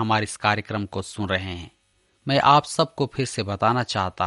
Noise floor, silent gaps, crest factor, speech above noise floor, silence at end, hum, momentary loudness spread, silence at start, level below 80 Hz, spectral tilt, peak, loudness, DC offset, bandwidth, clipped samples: -65 dBFS; none; 20 dB; 42 dB; 0 s; none; 13 LU; 0 s; -54 dBFS; -4.5 dB/octave; -4 dBFS; -23 LUFS; under 0.1%; 11.5 kHz; under 0.1%